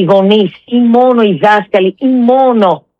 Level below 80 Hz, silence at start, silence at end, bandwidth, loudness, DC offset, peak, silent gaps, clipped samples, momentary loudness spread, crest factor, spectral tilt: -64 dBFS; 0 s; 0.2 s; 6.2 kHz; -9 LUFS; under 0.1%; 0 dBFS; none; under 0.1%; 4 LU; 8 dB; -8 dB/octave